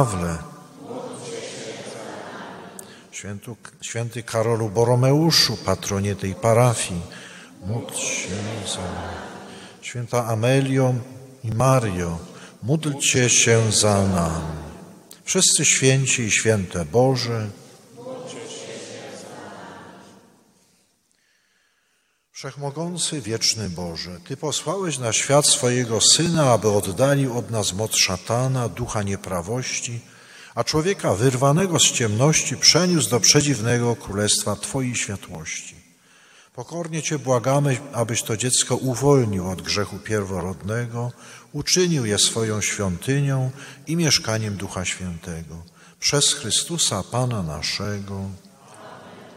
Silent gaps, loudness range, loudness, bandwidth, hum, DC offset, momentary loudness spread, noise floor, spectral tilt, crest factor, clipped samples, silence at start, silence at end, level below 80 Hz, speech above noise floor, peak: none; 11 LU; -20 LUFS; 16 kHz; none; under 0.1%; 20 LU; -67 dBFS; -3.5 dB/octave; 22 dB; under 0.1%; 0 s; 0 s; -50 dBFS; 46 dB; 0 dBFS